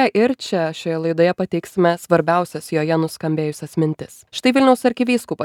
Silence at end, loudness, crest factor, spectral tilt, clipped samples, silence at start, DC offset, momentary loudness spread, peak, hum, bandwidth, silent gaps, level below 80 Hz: 0 s; -19 LUFS; 18 dB; -6 dB/octave; under 0.1%; 0 s; under 0.1%; 8 LU; -2 dBFS; none; 16.5 kHz; none; -62 dBFS